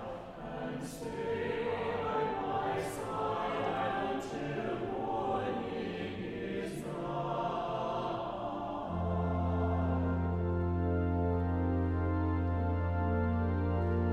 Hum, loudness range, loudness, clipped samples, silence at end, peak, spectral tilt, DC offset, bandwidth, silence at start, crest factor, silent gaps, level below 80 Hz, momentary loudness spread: none; 4 LU; -35 LUFS; under 0.1%; 0 s; -20 dBFS; -7.5 dB/octave; under 0.1%; 12 kHz; 0 s; 12 dB; none; -46 dBFS; 7 LU